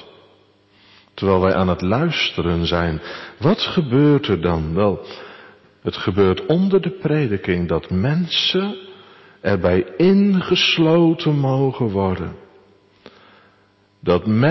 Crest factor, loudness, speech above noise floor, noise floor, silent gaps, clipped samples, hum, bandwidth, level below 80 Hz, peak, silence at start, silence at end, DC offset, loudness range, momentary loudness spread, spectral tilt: 14 dB; -18 LUFS; 39 dB; -57 dBFS; none; under 0.1%; none; 6 kHz; -38 dBFS; -6 dBFS; 0 s; 0 s; under 0.1%; 3 LU; 12 LU; -7 dB/octave